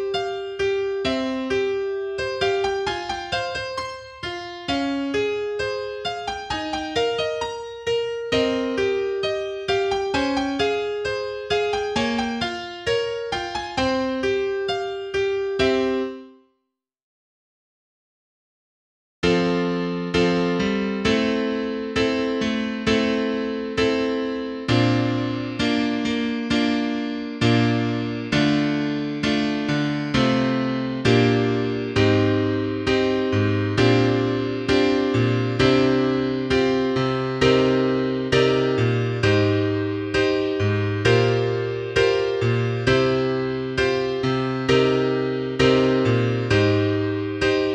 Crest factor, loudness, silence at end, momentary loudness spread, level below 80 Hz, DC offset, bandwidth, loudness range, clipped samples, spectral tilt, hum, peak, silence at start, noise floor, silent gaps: 18 dB; -22 LUFS; 0 s; 8 LU; -46 dBFS; under 0.1%; 9.8 kHz; 6 LU; under 0.1%; -6 dB/octave; none; -4 dBFS; 0 s; -78 dBFS; 17.03-19.22 s